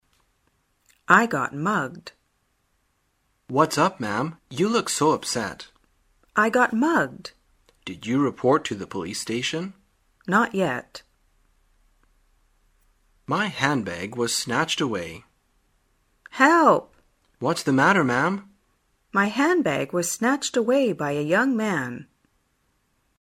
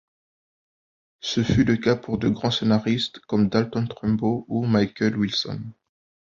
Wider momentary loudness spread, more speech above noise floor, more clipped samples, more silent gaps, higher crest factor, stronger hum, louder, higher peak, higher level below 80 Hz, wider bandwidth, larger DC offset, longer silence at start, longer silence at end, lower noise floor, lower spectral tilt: first, 15 LU vs 7 LU; second, 47 dB vs over 68 dB; neither; neither; first, 24 dB vs 18 dB; neither; about the same, -23 LUFS vs -23 LUFS; first, 0 dBFS vs -6 dBFS; second, -64 dBFS vs -50 dBFS; first, 16 kHz vs 7.4 kHz; neither; second, 1.1 s vs 1.25 s; first, 1.2 s vs 0.55 s; second, -70 dBFS vs under -90 dBFS; second, -4.5 dB/octave vs -6.5 dB/octave